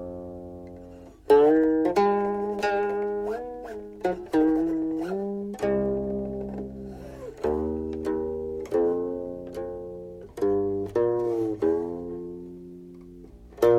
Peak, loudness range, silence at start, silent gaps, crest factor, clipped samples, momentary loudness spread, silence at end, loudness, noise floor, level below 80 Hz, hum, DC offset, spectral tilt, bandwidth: -8 dBFS; 6 LU; 0 s; none; 18 dB; under 0.1%; 18 LU; 0 s; -26 LUFS; -46 dBFS; -50 dBFS; none; under 0.1%; -7.5 dB/octave; 14 kHz